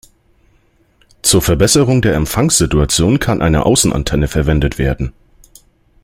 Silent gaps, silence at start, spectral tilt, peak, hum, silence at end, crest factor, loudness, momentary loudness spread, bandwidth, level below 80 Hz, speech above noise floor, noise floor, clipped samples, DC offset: none; 1.25 s; -4.5 dB/octave; 0 dBFS; none; 0.95 s; 14 dB; -13 LUFS; 6 LU; 16.5 kHz; -26 dBFS; 41 dB; -54 dBFS; under 0.1%; under 0.1%